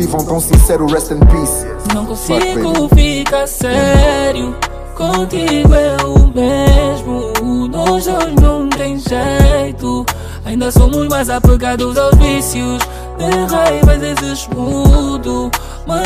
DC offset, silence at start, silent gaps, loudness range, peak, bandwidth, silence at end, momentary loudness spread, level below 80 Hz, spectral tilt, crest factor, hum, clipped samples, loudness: under 0.1%; 0 s; none; 2 LU; 0 dBFS; 15.5 kHz; 0 s; 9 LU; -14 dBFS; -5.5 dB/octave; 12 dB; none; under 0.1%; -13 LUFS